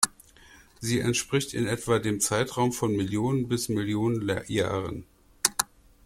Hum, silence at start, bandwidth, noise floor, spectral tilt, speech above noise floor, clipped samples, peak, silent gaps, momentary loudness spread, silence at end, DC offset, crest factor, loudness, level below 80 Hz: none; 0 s; 16.5 kHz; -54 dBFS; -4 dB/octave; 27 dB; under 0.1%; 0 dBFS; none; 5 LU; 0.4 s; under 0.1%; 28 dB; -27 LUFS; -54 dBFS